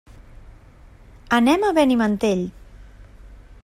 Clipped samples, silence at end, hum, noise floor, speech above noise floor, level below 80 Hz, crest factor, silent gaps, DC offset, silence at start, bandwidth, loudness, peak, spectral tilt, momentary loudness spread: under 0.1%; 0.1 s; none; -47 dBFS; 29 dB; -46 dBFS; 18 dB; none; under 0.1%; 1.3 s; 16 kHz; -19 LUFS; -4 dBFS; -5.5 dB/octave; 8 LU